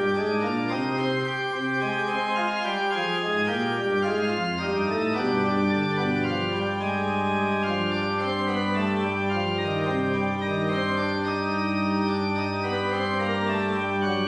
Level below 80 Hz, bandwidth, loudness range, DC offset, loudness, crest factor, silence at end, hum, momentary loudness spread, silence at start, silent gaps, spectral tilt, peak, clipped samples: -62 dBFS; 10.5 kHz; 1 LU; under 0.1%; -25 LUFS; 14 dB; 0 s; none; 2 LU; 0 s; none; -6.5 dB/octave; -12 dBFS; under 0.1%